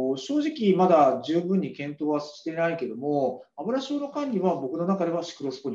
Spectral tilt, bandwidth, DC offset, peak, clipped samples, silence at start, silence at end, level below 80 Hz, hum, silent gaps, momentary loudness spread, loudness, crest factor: -7 dB/octave; 7.6 kHz; under 0.1%; -8 dBFS; under 0.1%; 0 s; 0 s; -76 dBFS; none; none; 11 LU; -26 LUFS; 16 dB